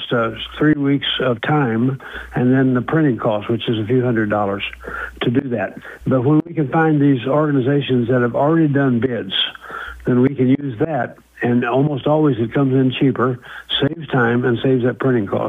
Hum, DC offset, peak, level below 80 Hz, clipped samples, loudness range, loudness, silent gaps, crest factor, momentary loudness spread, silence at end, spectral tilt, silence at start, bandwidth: none; under 0.1%; -4 dBFS; -48 dBFS; under 0.1%; 2 LU; -18 LUFS; none; 12 dB; 8 LU; 0 s; -8.5 dB/octave; 0 s; 4 kHz